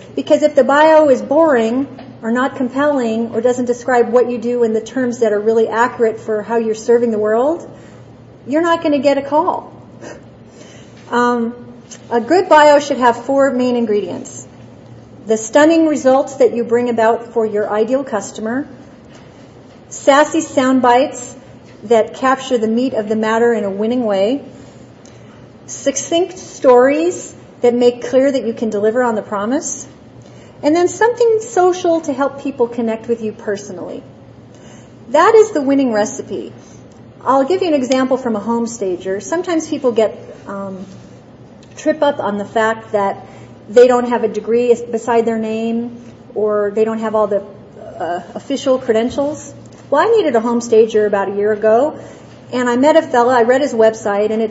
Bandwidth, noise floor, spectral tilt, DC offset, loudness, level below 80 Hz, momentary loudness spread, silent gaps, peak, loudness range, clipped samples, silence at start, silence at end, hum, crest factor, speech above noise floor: 8 kHz; -39 dBFS; -4.5 dB/octave; under 0.1%; -15 LUFS; -56 dBFS; 15 LU; none; 0 dBFS; 5 LU; under 0.1%; 0 s; 0 s; none; 16 dB; 25 dB